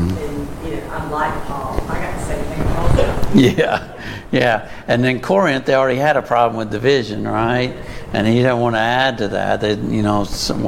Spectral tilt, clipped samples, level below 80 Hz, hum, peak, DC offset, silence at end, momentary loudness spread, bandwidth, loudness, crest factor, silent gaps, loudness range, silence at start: -6 dB/octave; under 0.1%; -30 dBFS; none; -2 dBFS; under 0.1%; 0 s; 10 LU; 17 kHz; -18 LUFS; 16 dB; none; 2 LU; 0 s